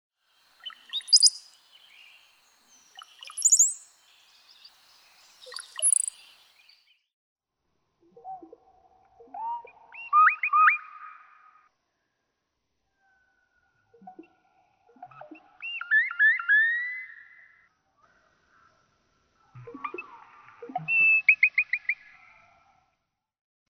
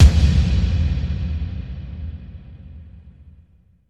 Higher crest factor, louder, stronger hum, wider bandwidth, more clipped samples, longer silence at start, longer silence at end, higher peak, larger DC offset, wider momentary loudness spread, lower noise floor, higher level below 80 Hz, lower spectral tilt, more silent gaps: first, 24 dB vs 18 dB; about the same, -22 LUFS vs -21 LUFS; neither; first, 18.5 kHz vs 8.8 kHz; neither; first, 0.65 s vs 0 s; first, 1.75 s vs 0.8 s; second, -6 dBFS vs 0 dBFS; neither; about the same, 26 LU vs 24 LU; first, -80 dBFS vs -53 dBFS; second, -82 dBFS vs -22 dBFS; second, 2.5 dB/octave vs -6.5 dB/octave; first, 7.13-7.36 s vs none